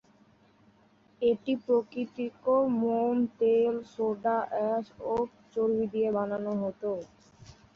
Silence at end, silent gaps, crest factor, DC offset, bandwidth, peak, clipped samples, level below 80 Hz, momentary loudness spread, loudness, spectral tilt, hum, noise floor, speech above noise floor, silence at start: 0.25 s; none; 14 dB; under 0.1%; 6.8 kHz; -14 dBFS; under 0.1%; -66 dBFS; 9 LU; -29 LUFS; -8 dB/octave; none; -63 dBFS; 34 dB; 1.2 s